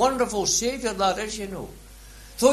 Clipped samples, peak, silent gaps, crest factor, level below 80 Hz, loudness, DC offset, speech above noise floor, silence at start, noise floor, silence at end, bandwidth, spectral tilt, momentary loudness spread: under 0.1%; -4 dBFS; none; 20 dB; -46 dBFS; -24 LUFS; under 0.1%; 19 dB; 0 s; -45 dBFS; 0 s; 13.5 kHz; -2.5 dB/octave; 19 LU